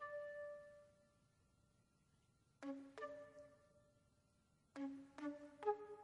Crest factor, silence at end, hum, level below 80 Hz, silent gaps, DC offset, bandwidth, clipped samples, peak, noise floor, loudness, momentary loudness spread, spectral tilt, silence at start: 26 dB; 0 s; none; -86 dBFS; none; under 0.1%; 11 kHz; under 0.1%; -28 dBFS; -79 dBFS; -51 LUFS; 18 LU; -5.5 dB/octave; 0 s